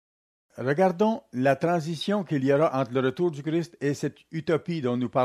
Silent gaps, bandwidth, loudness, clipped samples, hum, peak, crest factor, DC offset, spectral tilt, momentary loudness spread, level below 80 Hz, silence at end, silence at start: none; 13.5 kHz; -26 LUFS; under 0.1%; none; -8 dBFS; 16 dB; under 0.1%; -7 dB/octave; 7 LU; -70 dBFS; 0 s; 0.55 s